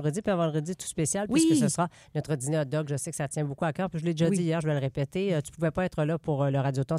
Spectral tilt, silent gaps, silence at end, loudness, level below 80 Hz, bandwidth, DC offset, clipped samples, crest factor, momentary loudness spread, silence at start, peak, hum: -6 dB/octave; none; 0 s; -28 LUFS; -58 dBFS; 14 kHz; under 0.1%; under 0.1%; 14 dB; 7 LU; 0 s; -12 dBFS; none